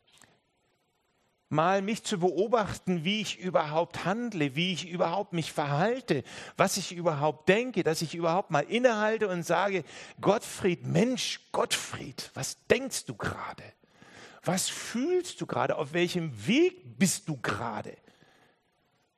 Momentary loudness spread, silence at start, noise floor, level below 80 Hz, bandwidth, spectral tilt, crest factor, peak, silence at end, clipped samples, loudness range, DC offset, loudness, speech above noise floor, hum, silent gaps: 9 LU; 1.5 s; -73 dBFS; -66 dBFS; 13 kHz; -4.5 dB/octave; 22 dB; -8 dBFS; 1.2 s; under 0.1%; 4 LU; under 0.1%; -29 LUFS; 44 dB; none; none